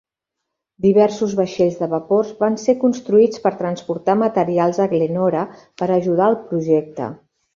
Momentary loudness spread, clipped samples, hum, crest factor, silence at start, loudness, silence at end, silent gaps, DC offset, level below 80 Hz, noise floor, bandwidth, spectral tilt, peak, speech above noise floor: 9 LU; under 0.1%; none; 16 dB; 0.8 s; -18 LUFS; 0.4 s; none; under 0.1%; -60 dBFS; -81 dBFS; 7.4 kHz; -7 dB/octave; -2 dBFS; 63 dB